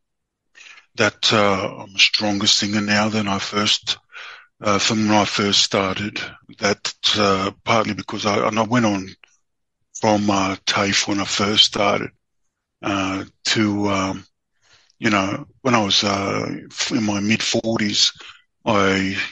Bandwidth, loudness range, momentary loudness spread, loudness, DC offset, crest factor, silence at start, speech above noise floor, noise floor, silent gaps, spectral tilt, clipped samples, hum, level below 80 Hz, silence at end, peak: 8.8 kHz; 3 LU; 11 LU; -19 LUFS; under 0.1%; 20 dB; 0.65 s; 57 dB; -77 dBFS; none; -3 dB/octave; under 0.1%; none; -56 dBFS; 0 s; -2 dBFS